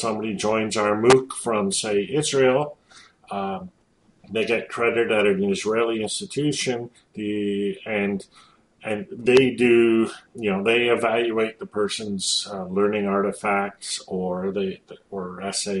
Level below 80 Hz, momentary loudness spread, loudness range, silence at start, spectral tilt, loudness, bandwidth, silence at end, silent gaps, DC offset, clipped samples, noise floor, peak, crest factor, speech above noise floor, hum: -62 dBFS; 13 LU; 5 LU; 0 s; -4 dB/octave; -23 LUFS; 11.5 kHz; 0 s; none; under 0.1%; under 0.1%; -58 dBFS; -4 dBFS; 18 dB; 35 dB; none